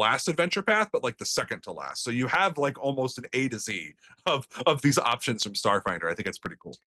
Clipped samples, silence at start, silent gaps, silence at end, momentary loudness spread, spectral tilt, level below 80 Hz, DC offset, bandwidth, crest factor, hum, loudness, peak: under 0.1%; 0 s; none; 0.2 s; 11 LU; -3.5 dB/octave; -66 dBFS; under 0.1%; 13 kHz; 20 dB; none; -27 LUFS; -8 dBFS